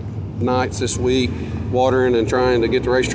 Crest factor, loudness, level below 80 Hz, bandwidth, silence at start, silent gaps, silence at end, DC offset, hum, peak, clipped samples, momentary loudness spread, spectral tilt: 14 dB; -19 LUFS; -34 dBFS; 8 kHz; 0 s; none; 0 s; under 0.1%; none; -4 dBFS; under 0.1%; 7 LU; -5.5 dB/octave